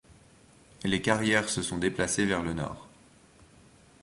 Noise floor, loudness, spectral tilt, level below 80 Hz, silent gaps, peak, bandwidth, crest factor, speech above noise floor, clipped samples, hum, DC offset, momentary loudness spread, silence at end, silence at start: -58 dBFS; -28 LUFS; -4 dB/octave; -54 dBFS; none; -6 dBFS; 11.5 kHz; 24 dB; 29 dB; under 0.1%; none; under 0.1%; 11 LU; 1.15 s; 0.1 s